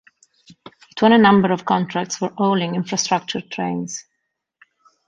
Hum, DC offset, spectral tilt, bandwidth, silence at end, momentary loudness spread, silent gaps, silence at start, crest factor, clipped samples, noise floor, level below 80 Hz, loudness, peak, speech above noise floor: none; under 0.1%; -4.5 dB/octave; 7.8 kHz; 1.05 s; 14 LU; none; 0.95 s; 18 dB; under 0.1%; -76 dBFS; -60 dBFS; -18 LUFS; -2 dBFS; 58 dB